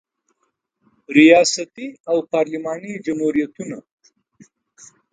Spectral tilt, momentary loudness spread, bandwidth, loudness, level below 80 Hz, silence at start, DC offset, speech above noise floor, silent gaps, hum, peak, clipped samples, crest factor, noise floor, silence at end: -4 dB/octave; 21 LU; 9.4 kHz; -17 LUFS; -66 dBFS; 1.1 s; under 0.1%; 54 dB; 2.00-2.04 s; none; 0 dBFS; under 0.1%; 20 dB; -71 dBFS; 1.35 s